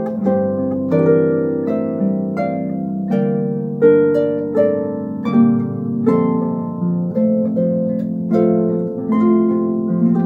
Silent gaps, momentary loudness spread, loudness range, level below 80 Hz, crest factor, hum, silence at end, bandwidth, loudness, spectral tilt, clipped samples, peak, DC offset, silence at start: none; 7 LU; 2 LU; -60 dBFS; 16 dB; none; 0 s; 4.4 kHz; -17 LUFS; -11.5 dB/octave; under 0.1%; 0 dBFS; under 0.1%; 0 s